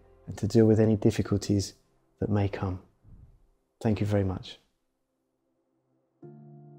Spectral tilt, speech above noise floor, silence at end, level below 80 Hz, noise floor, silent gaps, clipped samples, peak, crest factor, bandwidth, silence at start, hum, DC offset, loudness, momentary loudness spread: -7.5 dB/octave; 52 dB; 0.2 s; -54 dBFS; -78 dBFS; none; under 0.1%; -10 dBFS; 20 dB; 15 kHz; 0.25 s; none; under 0.1%; -27 LUFS; 17 LU